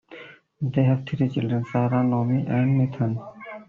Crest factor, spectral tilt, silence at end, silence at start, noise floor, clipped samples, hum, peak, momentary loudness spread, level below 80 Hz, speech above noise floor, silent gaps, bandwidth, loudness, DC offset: 16 dB; -8.5 dB/octave; 0.05 s; 0.1 s; -45 dBFS; under 0.1%; none; -8 dBFS; 11 LU; -58 dBFS; 23 dB; none; 4.1 kHz; -24 LUFS; under 0.1%